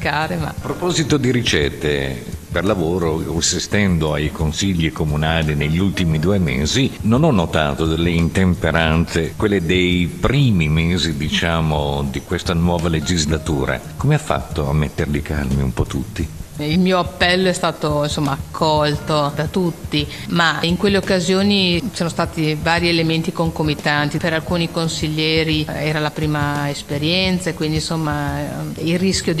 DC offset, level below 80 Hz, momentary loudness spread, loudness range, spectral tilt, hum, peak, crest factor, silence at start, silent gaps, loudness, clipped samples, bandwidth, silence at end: 0.4%; -32 dBFS; 6 LU; 3 LU; -5 dB/octave; none; -2 dBFS; 16 dB; 0 s; none; -18 LUFS; under 0.1%; 14.5 kHz; 0 s